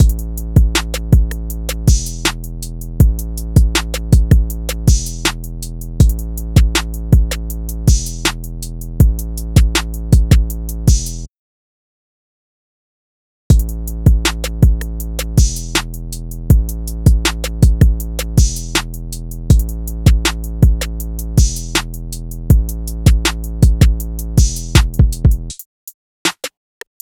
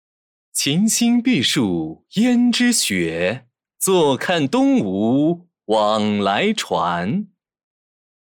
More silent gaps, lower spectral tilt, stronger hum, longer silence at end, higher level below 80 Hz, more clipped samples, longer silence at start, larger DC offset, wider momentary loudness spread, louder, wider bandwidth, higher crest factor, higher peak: first, 11.30-13.50 s, 25.66-25.87 s, 25.94-26.25 s vs none; about the same, -5 dB/octave vs -4 dB/octave; neither; second, 0.55 s vs 1.05 s; first, -16 dBFS vs -62 dBFS; first, 0.1% vs under 0.1%; second, 0 s vs 0.55 s; neither; first, 14 LU vs 9 LU; about the same, -16 LUFS vs -18 LUFS; about the same, 18.5 kHz vs 19.5 kHz; about the same, 14 dB vs 14 dB; first, 0 dBFS vs -6 dBFS